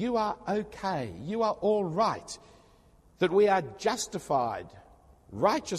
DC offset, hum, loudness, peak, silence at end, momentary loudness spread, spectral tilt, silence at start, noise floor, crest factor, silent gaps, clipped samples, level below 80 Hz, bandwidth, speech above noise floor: under 0.1%; none; -29 LUFS; -10 dBFS; 0 s; 14 LU; -5 dB/octave; 0 s; -60 dBFS; 20 dB; none; under 0.1%; -60 dBFS; 14 kHz; 31 dB